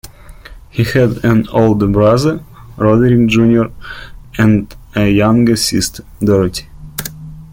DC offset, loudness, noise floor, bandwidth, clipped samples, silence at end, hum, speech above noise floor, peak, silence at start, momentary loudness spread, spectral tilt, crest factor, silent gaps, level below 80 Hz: under 0.1%; -12 LUFS; -35 dBFS; 17 kHz; under 0.1%; 0.05 s; none; 23 dB; 0 dBFS; 0.05 s; 16 LU; -6 dB/octave; 12 dB; none; -34 dBFS